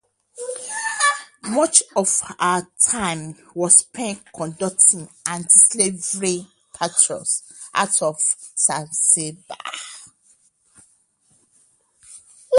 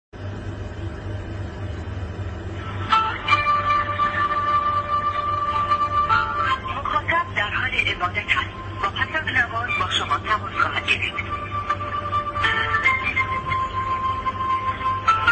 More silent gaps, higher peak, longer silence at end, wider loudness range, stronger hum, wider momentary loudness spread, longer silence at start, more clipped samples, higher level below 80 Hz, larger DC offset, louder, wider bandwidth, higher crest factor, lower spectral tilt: neither; first, 0 dBFS vs -4 dBFS; about the same, 0 s vs 0 s; first, 6 LU vs 2 LU; neither; first, 17 LU vs 12 LU; first, 0.35 s vs 0.15 s; neither; second, -62 dBFS vs -40 dBFS; neither; first, -17 LUFS vs -22 LUFS; first, 12 kHz vs 8.8 kHz; about the same, 22 dB vs 20 dB; second, -1.5 dB/octave vs -4.5 dB/octave